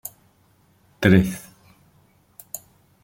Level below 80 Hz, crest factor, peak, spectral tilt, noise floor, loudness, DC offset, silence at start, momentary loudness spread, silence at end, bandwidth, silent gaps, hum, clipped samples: -50 dBFS; 22 dB; -2 dBFS; -6.5 dB/octave; -60 dBFS; -19 LUFS; under 0.1%; 1 s; 20 LU; 0.45 s; 17 kHz; none; none; under 0.1%